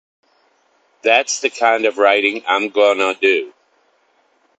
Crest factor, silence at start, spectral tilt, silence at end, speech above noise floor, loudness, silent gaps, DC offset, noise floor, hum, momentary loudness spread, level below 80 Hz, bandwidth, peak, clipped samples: 18 dB; 1.05 s; -1 dB/octave; 1.1 s; 44 dB; -15 LUFS; none; under 0.1%; -60 dBFS; none; 6 LU; -68 dBFS; 9 kHz; 0 dBFS; under 0.1%